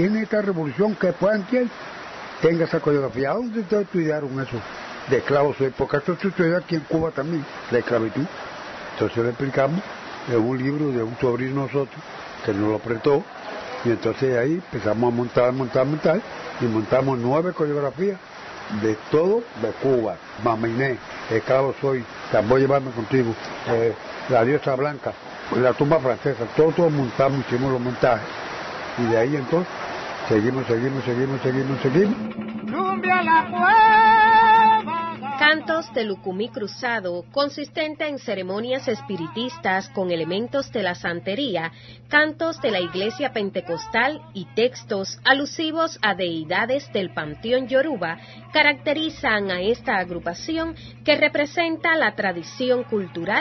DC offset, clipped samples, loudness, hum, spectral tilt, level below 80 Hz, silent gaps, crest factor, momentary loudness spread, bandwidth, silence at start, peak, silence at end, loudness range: under 0.1%; under 0.1%; -22 LUFS; none; -6 dB/octave; -56 dBFS; none; 20 dB; 11 LU; 6.2 kHz; 0 s; -2 dBFS; 0 s; 7 LU